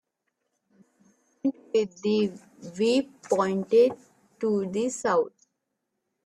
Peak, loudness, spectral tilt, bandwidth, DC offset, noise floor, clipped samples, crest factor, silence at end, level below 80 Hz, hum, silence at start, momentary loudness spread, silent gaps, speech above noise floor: -10 dBFS; -26 LUFS; -5 dB/octave; 11.5 kHz; under 0.1%; -81 dBFS; under 0.1%; 18 dB; 0.95 s; -72 dBFS; none; 1.45 s; 10 LU; none; 56 dB